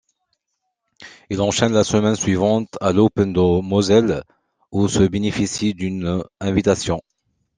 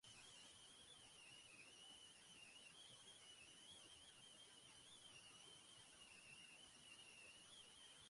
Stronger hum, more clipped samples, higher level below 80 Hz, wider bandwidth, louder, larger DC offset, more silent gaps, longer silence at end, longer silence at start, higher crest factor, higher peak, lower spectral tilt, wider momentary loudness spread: neither; neither; first, -48 dBFS vs -88 dBFS; second, 10 kHz vs 11.5 kHz; first, -19 LUFS vs -62 LUFS; neither; neither; first, 0.6 s vs 0 s; first, 1 s vs 0.05 s; about the same, 18 dB vs 14 dB; first, -2 dBFS vs -50 dBFS; first, -5.5 dB/octave vs -0.5 dB/octave; first, 8 LU vs 2 LU